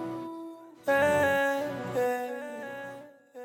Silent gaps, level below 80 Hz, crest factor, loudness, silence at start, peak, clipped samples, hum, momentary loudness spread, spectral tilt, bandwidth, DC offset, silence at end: none; -70 dBFS; 14 dB; -29 LUFS; 0 s; -16 dBFS; under 0.1%; none; 19 LU; -5 dB/octave; 19 kHz; under 0.1%; 0 s